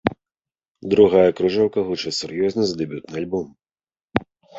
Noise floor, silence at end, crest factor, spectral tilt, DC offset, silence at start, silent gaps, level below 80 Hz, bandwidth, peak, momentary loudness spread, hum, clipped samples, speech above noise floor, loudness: under -90 dBFS; 0 s; 20 dB; -5.5 dB/octave; under 0.1%; 0.05 s; 0.68-0.75 s, 4.04-4.08 s; -52 dBFS; 8 kHz; -2 dBFS; 13 LU; none; under 0.1%; over 71 dB; -20 LUFS